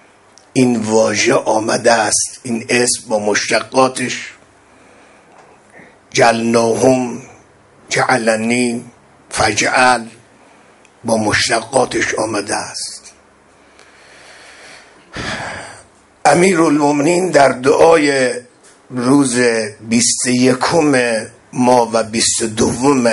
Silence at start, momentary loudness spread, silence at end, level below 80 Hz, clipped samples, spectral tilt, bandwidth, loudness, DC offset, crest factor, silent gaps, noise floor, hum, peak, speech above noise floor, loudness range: 0.55 s; 13 LU; 0 s; -48 dBFS; under 0.1%; -3.5 dB/octave; 11.5 kHz; -14 LUFS; under 0.1%; 16 dB; none; -48 dBFS; none; 0 dBFS; 34 dB; 7 LU